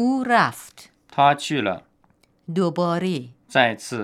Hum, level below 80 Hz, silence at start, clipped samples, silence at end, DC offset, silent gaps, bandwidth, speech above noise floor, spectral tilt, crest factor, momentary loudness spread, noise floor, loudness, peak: none; -70 dBFS; 0 s; under 0.1%; 0 s; under 0.1%; none; 15 kHz; 40 dB; -5 dB/octave; 20 dB; 12 LU; -61 dBFS; -21 LUFS; -2 dBFS